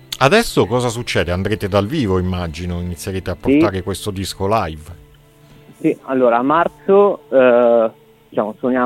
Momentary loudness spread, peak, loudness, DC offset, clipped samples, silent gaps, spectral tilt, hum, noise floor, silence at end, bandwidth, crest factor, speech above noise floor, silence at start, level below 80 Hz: 11 LU; 0 dBFS; -17 LUFS; under 0.1%; under 0.1%; none; -6 dB/octave; none; -46 dBFS; 0 s; 16.5 kHz; 16 dB; 30 dB; 0.1 s; -40 dBFS